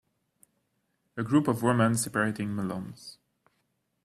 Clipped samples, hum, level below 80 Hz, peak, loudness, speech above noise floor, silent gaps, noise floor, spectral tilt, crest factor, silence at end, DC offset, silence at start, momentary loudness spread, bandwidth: under 0.1%; none; -64 dBFS; -10 dBFS; -28 LUFS; 49 dB; none; -76 dBFS; -5.5 dB/octave; 20 dB; 0.9 s; under 0.1%; 1.15 s; 19 LU; 15 kHz